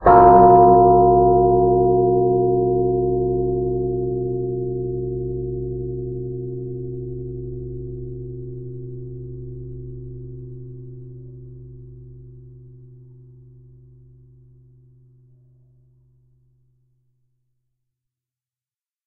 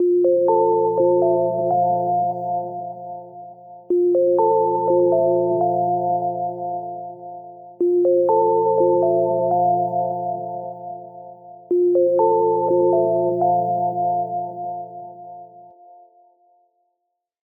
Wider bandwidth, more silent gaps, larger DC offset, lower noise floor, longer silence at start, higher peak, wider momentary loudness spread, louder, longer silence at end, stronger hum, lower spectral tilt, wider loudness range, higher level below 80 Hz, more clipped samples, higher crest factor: first, 2.6 kHz vs 1.4 kHz; neither; neither; first, under -90 dBFS vs -77 dBFS; about the same, 0 s vs 0 s; first, 0 dBFS vs -6 dBFS; first, 25 LU vs 19 LU; about the same, -17 LUFS vs -19 LUFS; first, 6.55 s vs 1.9 s; neither; second, -11 dB/octave vs -13 dB/octave; first, 24 LU vs 5 LU; first, -40 dBFS vs -76 dBFS; neither; first, 20 dB vs 14 dB